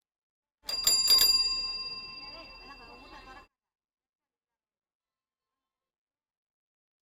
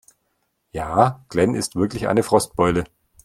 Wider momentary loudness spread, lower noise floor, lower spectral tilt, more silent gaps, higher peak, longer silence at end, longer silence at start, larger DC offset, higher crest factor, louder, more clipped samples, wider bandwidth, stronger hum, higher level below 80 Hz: first, 23 LU vs 11 LU; first, under -90 dBFS vs -71 dBFS; second, 2 dB/octave vs -5.5 dB/octave; neither; second, -8 dBFS vs 0 dBFS; first, 3.7 s vs 0.4 s; about the same, 0.65 s vs 0.75 s; neither; about the same, 26 dB vs 22 dB; second, -23 LUFS vs -20 LUFS; neither; about the same, 16.5 kHz vs 15.5 kHz; neither; second, -60 dBFS vs -46 dBFS